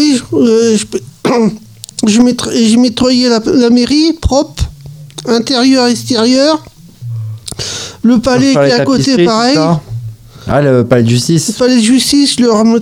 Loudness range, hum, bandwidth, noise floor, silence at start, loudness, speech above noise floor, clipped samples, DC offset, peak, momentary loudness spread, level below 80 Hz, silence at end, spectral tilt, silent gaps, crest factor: 2 LU; none; 15.5 kHz; -30 dBFS; 0 s; -10 LUFS; 21 dB; under 0.1%; 0.2%; 0 dBFS; 13 LU; -32 dBFS; 0 s; -5 dB/octave; none; 10 dB